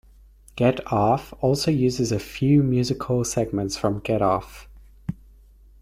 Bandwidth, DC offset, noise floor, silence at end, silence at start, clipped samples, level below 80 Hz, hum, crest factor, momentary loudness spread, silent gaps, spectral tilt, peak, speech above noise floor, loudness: 15.5 kHz; under 0.1%; -51 dBFS; 0.7 s; 0.55 s; under 0.1%; -46 dBFS; none; 18 dB; 16 LU; none; -6 dB/octave; -6 dBFS; 29 dB; -23 LUFS